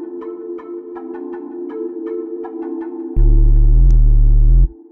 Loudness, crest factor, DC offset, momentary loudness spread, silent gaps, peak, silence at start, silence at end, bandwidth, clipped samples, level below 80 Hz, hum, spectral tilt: -18 LUFS; 10 dB; under 0.1%; 15 LU; none; -2 dBFS; 0 s; 0.2 s; 1.9 kHz; under 0.1%; -14 dBFS; none; -12 dB/octave